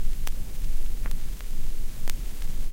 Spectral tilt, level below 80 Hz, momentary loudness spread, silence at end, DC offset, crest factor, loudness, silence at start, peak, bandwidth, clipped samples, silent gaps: -4 dB/octave; -26 dBFS; 2 LU; 0 s; under 0.1%; 12 dB; -37 LUFS; 0 s; -10 dBFS; 16 kHz; under 0.1%; none